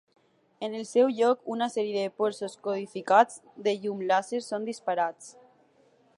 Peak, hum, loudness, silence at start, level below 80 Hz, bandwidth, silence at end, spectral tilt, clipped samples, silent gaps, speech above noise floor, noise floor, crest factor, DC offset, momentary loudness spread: -8 dBFS; none; -28 LUFS; 0.6 s; -84 dBFS; 11.5 kHz; 0.85 s; -4.5 dB/octave; under 0.1%; none; 36 dB; -63 dBFS; 22 dB; under 0.1%; 12 LU